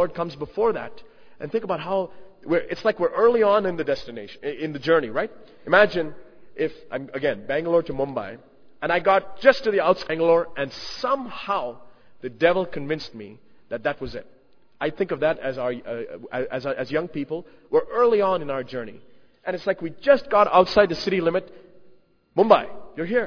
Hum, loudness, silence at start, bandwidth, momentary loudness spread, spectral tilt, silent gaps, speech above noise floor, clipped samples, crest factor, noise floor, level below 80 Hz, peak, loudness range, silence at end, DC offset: none; -23 LUFS; 0 s; 5.4 kHz; 16 LU; -6 dB/octave; none; 31 dB; under 0.1%; 24 dB; -53 dBFS; -56 dBFS; 0 dBFS; 6 LU; 0 s; under 0.1%